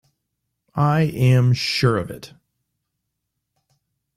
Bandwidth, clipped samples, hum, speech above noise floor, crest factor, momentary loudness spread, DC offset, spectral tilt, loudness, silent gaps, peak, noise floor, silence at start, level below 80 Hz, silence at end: 14 kHz; under 0.1%; none; 60 dB; 18 dB; 16 LU; under 0.1%; -6.5 dB/octave; -19 LUFS; none; -4 dBFS; -78 dBFS; 0.75 s; -54 dBFS; 1.9 s